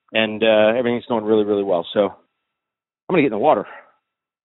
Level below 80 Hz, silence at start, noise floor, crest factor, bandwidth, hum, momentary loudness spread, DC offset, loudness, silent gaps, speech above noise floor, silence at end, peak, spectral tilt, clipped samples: -62 dBFS; 0.15 s; -85 dBFS; 18 dB; 4.1 kHz; none; 6 LU; under 0.1%; -18 LUFS; 3.03-3.07 s; 67 dB; 0.65 s; -2 dBFS; -3.5 dB/octave; under 0.1%